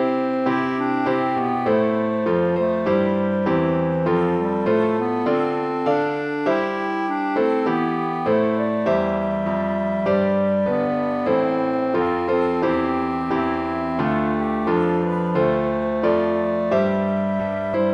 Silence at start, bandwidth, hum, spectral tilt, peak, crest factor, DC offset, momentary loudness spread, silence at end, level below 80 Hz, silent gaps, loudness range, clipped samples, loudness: 0 s; 8.2 kHz; none; -8.5 dB/octave; -8 dBFS; 14 dB; under 0.1%; 3 LU; 0 s; -50 dBFS; none; 1 LU; under 0.1%; -21 LUFS